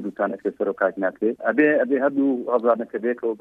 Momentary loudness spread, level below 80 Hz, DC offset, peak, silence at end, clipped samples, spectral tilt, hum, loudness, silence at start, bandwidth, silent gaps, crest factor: 7 LU; -72 dBFS; under 0.1%; -6 dBFS; 0.05 s; under 0.1%; -9 dB/octave; none; -22 LUFS; 0 s; 4 kHz; none; 16 dB